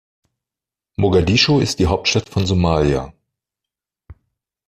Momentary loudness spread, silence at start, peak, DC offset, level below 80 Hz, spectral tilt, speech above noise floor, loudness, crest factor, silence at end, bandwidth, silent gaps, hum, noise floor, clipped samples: 9 LU; 1 s; -2 dBFS; under 0.1%; -38 dBFS; -5 dB/octave; 72 dB; -17 LUFS; 18 dB; 0.55 s; 14 kHz; none; none; -88 dBFS; under 0.1%